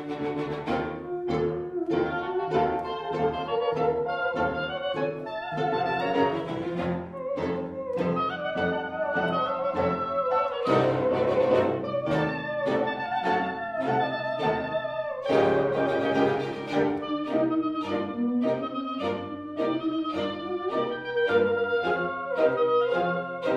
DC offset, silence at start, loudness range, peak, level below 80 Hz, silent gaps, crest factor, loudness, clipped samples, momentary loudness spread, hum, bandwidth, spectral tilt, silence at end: under 0.1%; 0 s; 3 LU; -8 dBFS; -58 dBFS; none; 18 dB; -27 LUFS; under 0.1%; 7 LU; none; 9.2 kHz; -7 dB/octave; 0 s